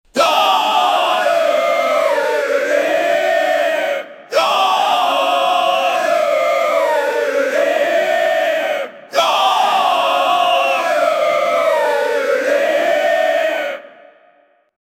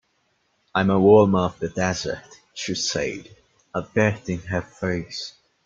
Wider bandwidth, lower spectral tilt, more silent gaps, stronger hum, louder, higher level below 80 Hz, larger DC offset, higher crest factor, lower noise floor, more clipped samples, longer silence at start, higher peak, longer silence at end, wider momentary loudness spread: first, 16.5 kHz vs 7.6 kHz; second, -1 dB/octave vs -5 dB/octave; neither; neither; first, -15 LUFS vs -22 LUFS; second, -68 dBFS vs -54 dBFS; neither; about the same, 16 dB vs 20 dB; second, -54 dBFS vs -68 dBFS; neither; second, 0.15 s vs 0.75 s; about the same, 0 dBFS vs -2 dBFS; first, 1.1 s vs 0.35 s; second, 3 LU vs 17 LU